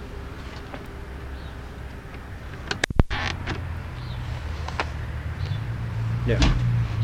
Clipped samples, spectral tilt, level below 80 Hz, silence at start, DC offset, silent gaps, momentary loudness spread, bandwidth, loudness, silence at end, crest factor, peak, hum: under 0.1%; -5.5 dB/octave; -32 dBFS; 0 s; under 0.1%; none; 15 LU; 12 kHz; -29 LUFS; 0 s; 26 dB; 0 dBFS; none